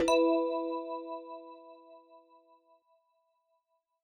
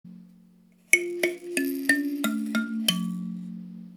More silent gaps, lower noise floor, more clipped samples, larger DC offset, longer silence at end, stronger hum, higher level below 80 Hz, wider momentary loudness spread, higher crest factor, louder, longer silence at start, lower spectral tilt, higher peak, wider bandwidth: neither; first, -79 dBFS vs -57 dBFS; neither; neither; first, 1.85 s vs 0 s; neither; first, -70 dBFS vs -78 dBFS; first, 25 LU vs 14 LU; second, 18 dB vs 28 dB; second, -32 LUFS vs -26 LUFS; about the same, 0 s vs 0.05 s; about the same, -3 dB/octave vs -3 dB/octave; second, -16 dBFS vs -2 dBFS; second, 13.5 kHz vs over 20 kHz